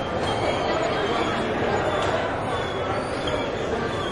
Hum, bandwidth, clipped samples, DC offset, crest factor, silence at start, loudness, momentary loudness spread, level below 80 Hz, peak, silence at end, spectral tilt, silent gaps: none; 11.5 kHz; under 0.1%; under 0.1%; 14 dB; 0 s; -25 LUFS; 3 LU; -44 dBFS; -10 dBFS; 0 s; -5 dB/octave; none